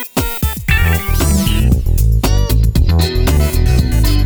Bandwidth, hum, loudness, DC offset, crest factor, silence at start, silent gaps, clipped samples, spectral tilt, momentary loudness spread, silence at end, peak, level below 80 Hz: over 20 kHz; none; -14 LUFS; under 0.1%; 10 dB; 0 s; none; under 0.1%; -5.5 dB/octave; 2 LU; 0 s; -2 dBFS; -14 dBFS